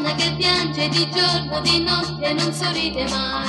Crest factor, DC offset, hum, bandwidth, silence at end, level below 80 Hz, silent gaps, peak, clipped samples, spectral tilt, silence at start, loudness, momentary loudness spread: 18 dB; under 0.1%; none; 12.5 kHz; 0 s; -42 dBFS; none; -4 dBFS; under 0.1%; -4 dB/octave; 0 s; -19 LUFS; 5 LU